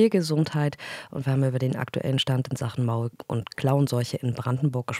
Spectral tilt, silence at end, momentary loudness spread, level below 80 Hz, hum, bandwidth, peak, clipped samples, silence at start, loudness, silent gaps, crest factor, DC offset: -6.5 dB/octave; 0 s; 7 LU; -64 dBFS; none; 14.5 kHz; -8 dBFS; under 0.1%; 0 s; -26 LUFS; none; 16 dB; under 0.1%